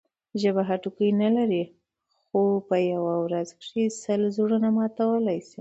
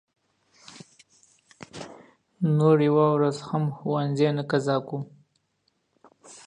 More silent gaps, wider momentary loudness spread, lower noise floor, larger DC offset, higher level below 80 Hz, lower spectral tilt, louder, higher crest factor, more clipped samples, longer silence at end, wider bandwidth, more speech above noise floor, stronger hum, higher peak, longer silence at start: neither; second, 7 LU vs 23 LU; about the same, -74 dBFS vs -73 dBFS; neither; about the same, -72 dBFS vs -72 dBFS; about the same, -7 dB/octave vs -7.5 dB/octave; about the same, -25 LUFS vs -24 LUFS; second, 14 dB vs 20 dB; neither; about the same, 0.2 s vs 0.1 s; second, 8 kHz vs 10 kHz; about the same, 50 dB vs 50 dB; neither; about the same, -10 dBFS vs -8 dBFS; second, 0.35 s vs 1.75 s